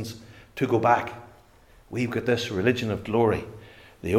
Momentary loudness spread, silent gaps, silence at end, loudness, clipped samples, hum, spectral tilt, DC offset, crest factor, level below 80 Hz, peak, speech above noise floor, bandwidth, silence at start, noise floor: 20 LU; none; 0 s; -25 LUFS; under 0.1%; none; -6 dB/octave; under 0.1%; 20 dB; -56 dBFS; -6 dBFS; 30 dB; 16 kHz; 0 s; -55 dBFS